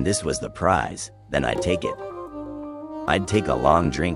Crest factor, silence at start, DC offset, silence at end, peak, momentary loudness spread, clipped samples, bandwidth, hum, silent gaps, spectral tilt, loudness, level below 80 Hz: 20 dB; 0 s; under 0.1%; 0 s; -2 dBFS; 15 LU; under 0.1%; 12 kHz; none; none; -5 dB/octave; -23 LUFS; -40 dBFS